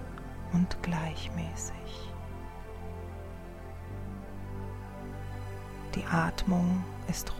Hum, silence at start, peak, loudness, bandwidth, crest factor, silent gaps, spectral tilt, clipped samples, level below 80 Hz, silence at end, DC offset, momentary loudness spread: none; 0 s; -16 dBFS; -35 LUFS; 15.5 kHz; 18 dB; none; -5.5 dB/octave; under 0.1%; -44 dBFS; 0 s; under 0.1%; 15 LU